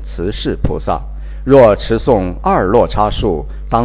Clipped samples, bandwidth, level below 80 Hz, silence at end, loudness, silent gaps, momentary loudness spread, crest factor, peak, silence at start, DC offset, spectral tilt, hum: 0.7%; 4 kHz; -24 dBFS; 0 s; -14 LUFS; none; 13 LU; 14 dB; 0 dBFS; 0 s; under 0.1%; -11 dB/octave; none